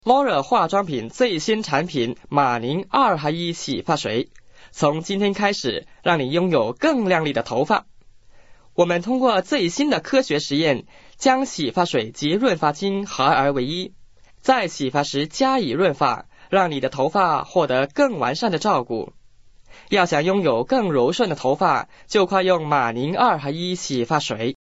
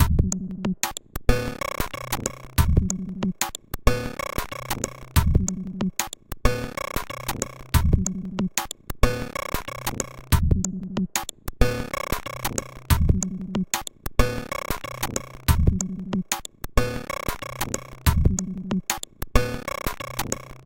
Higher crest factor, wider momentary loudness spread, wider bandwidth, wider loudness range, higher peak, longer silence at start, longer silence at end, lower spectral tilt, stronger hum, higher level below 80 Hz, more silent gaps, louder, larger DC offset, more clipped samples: about the same, 18 dB vs 22 dB; about the same, 6 LU vs 8 LU; second, 8 kHz vs 17 kHz; about the same, 2 LU vs 1 LU; about the same, -2 dBFS vs -2 dBFS; about the same, 0.05 s vs 0 s; about the same, 0.1 s vs 0.05 s; about the same, -3.5 dB/octave vs -4.5 dB/octave; neither; second, -56 dBFS vs -28 dBFS; neither; first, -21 LUFS vs -26 LUFS; first, 0.3% vs under 0.1%; neither